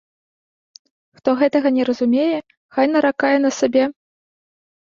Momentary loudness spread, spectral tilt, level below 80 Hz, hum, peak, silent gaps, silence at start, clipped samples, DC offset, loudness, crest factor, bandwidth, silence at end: 7 LU; -4 dB/octave; -66 dBFS; none; -4 dBFS; 2.57-2.69 s; 1.25 s; under 0.1%; under 0.1%; -18 LUFS; 16 dB; 7.4 kHz; 1.05 s